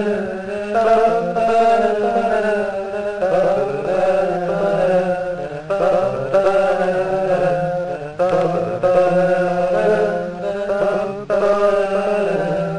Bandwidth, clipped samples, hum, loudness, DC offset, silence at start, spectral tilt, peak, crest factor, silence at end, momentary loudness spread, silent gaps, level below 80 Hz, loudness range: 11 kHz; under 0.1%; none; -18 LUFS; 0.8%; 0 s; -6.5 dB/octave; -4 dBFS; 12 dB; 0 s; 8 LU; none; -48 dBFS; 1 LU